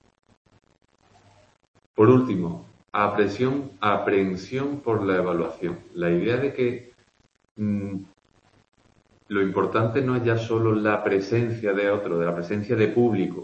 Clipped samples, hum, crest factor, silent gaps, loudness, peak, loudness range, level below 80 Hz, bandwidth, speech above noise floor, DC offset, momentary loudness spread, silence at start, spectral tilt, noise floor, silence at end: under 0.1%; none; 22 dB; 7.51-7.55 s; -24 LUFS; -2 dBFS; 5 LU; -60 dBFS; 8.2 kHz; 40 dB; under 0.1%; 9 LU; 2 s; -8 dB/octave; -63 dBFS; 0 s